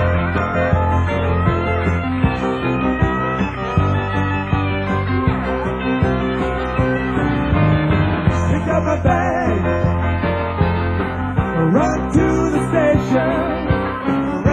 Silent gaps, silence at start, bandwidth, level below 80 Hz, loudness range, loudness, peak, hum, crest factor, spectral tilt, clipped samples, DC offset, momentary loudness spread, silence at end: none; 0 s; 9.8 kHz; -26 dBFS; 2 LU; -18 LUFS; -2 dBFS; none; 16 dB; -8 dB/octave; under 0.1%; under 0.1%; 4 LU; 0 s